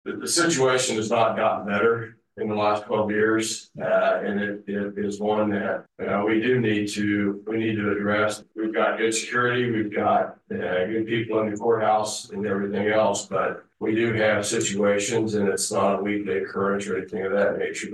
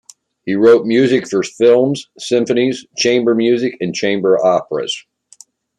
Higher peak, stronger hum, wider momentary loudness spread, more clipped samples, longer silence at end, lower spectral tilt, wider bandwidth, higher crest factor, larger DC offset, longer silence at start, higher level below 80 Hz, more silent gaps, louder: second, -8 dBFS vs 0 dBFS; neither; second, 7 LU vs 10 LU; neither; second, 0 s vs 0.8 s; about the same, -4 dB/octave vs -5 dB/octave; first, 12.5 kHz vs 11 kHz; about the same, 16 dB vs 14 dB; neither; second, 0.05 s vs 0.45 s; second, -68 dBFS vs -62 dBFS; neither; second, -24 LUFS vs -14 LUFS